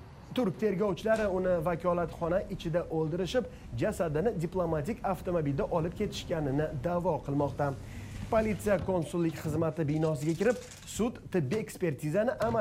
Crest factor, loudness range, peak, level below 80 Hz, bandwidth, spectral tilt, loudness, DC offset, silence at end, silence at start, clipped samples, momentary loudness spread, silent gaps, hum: 16 dB; 1 LU; -14 dBFS; -50 dBFS; 16 kHz; -6.5 dB/octave; -31 LUFS; under 0.1%; 0 s; 0 s; under 0.1%; 5 LU; none; none